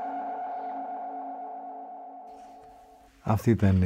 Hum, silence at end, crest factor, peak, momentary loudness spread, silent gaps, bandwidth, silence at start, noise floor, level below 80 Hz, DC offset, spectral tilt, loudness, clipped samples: none; 0 s; 20 dB; -10 dBFS; 23 LU; none; 16 kHz; 0 s; -54 dBFS; -56 dBFS; under 0.1%; -8.5 dB/octave; -31 LUFS; under 0.1%